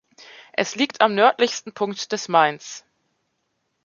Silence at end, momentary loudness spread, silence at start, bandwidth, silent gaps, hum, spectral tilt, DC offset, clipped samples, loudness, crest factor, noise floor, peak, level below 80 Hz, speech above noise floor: 1.05 s; 15 LU; 0.6 s; 7.4 kHz; none; none; -3 dB/octave; under 0.1%; under 0.1%; -21 LUFS; 20 dB; -73 dBFS; -2 dBFS; -76 dBFS; 53 dB